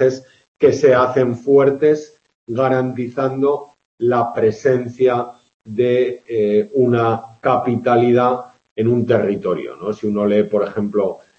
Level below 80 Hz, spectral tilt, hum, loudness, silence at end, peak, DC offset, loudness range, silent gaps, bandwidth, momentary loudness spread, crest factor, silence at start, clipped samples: -60 dBFS; -7.5 dB/octave; none; -17 LUFS; 0.2 s; -2 dBFS; under 0.1%; 2 LU; 0.48-0.55 s, 2.35-2.47 s, 3.85-3.98 s, 5.54-5.60 s, 8.71-8.76 s; 7.4 kHz; 9 LU; 16 dB; 0 s; under 0.1%